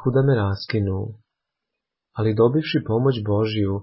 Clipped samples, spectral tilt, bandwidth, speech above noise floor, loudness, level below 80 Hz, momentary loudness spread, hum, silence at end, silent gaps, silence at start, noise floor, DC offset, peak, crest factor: under 0.1%; -12 dB/octave; 5.8 kHz; 63 dB; -21 LUFS; -44 dBFS; 8 LU; none; 0 s; none; 0 s; -83 dBFS; under 0.1%; -6 dBFS; 16 dB